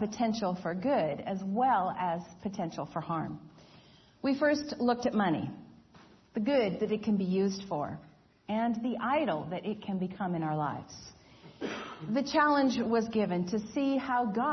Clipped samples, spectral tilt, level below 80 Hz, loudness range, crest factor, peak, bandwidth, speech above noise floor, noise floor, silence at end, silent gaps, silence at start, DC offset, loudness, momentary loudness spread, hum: under 0.1%; -6.5 dB/octave; -68 dBFS; 3 LU; 18 dB; -14 dBFS; 6.4 kHz; 28 dB; -58 dBFS; 0 s; none; 0 s; under 0.1%; -31 LUFS; 12 LU; none